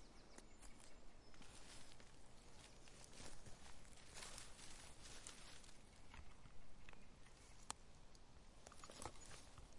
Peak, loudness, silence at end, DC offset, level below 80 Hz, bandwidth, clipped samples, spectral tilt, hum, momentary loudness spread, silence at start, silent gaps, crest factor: -26 dBFS; -61 LUFS; 0 s; under 0.1%; -66 dBFS; 11.5 kHz; under 0.1%; -2.5 dB/octave; none; 11 LU; 0 s; none; 30 dB